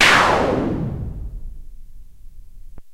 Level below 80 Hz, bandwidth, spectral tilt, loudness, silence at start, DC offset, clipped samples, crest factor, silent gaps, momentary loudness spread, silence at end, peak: -34 dBFS; 16 kHz; -3.5 dB/octave; -18 LUFS; 0 s; under 0.1%; under 0.1%; 20 dB; none; 24 LU; 0 s; 0 dBFS